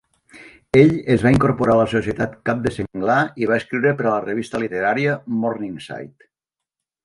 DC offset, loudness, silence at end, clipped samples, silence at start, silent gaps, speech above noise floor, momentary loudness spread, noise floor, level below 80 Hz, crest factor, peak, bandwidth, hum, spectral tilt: under 0.1%; -19 LUFS; 0.95 s; under 0.1%; 0.35 s; none; 66 dB; 10 LU; -85 dBFS; -46 dBFS; 20 dB; 0 dBFS; 11.5 kHz; none; -7.5 dB/octave